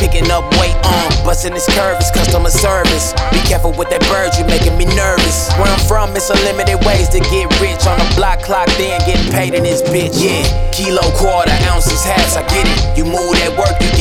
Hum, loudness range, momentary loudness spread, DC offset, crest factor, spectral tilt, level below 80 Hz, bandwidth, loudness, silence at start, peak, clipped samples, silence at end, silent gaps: none; 1 LU; 2 LU; under 0.1%; 10 dB; -4 dB/octave; -16 dBFS; 17 kHz; -12 LUFS; 0 s; 0 dBFS; under 0.1%; 0 s; none